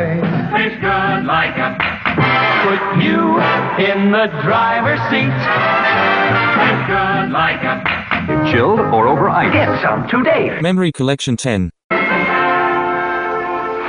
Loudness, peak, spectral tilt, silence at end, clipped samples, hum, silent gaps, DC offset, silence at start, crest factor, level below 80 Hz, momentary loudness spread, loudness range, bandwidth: -14 LUFS; 0 dBFS; -6 dB/octave; 0 s; under 0.1%; none; 11.84-11.89 s; under 0.1%; 0 s; 14 dB; -44 dBFS; 5 LU; 2 LU; 10.5 kHz